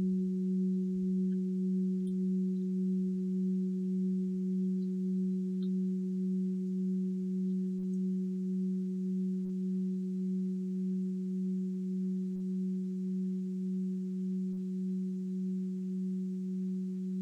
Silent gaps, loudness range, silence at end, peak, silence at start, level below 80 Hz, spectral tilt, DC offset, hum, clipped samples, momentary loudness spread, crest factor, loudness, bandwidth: none; 3 LU; 0 s; -26 dBFS; 0 s; -76 dBFS; -11 dB/octave; under 0.1%; none; under 0.1%; 4 LU; 8 dB; -34 LUFS; 0.4 kHz